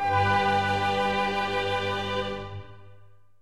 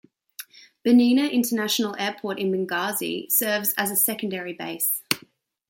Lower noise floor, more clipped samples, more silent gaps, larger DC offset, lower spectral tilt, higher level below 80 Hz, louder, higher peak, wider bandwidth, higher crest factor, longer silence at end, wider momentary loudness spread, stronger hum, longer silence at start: about the same, -56 dBFS vs -56 dBFS; neither; neither; first, 0.4% vs under 0.1%; first, -5 dB/octave vs -3 dB/octave; first, -52 dBFS vs -74 dBFS; second, -26 LUFS vs -23 LUFS; second, -12 dBFS vs -2 dBFS; second, 13 kHz vs 17 kHz; second, 14 dB vs 22 dB; about the same, 0.5 s vs 0.5 s; about the same, 12 LU vs 13 LU; neither; second, 0 s vs 0.4 s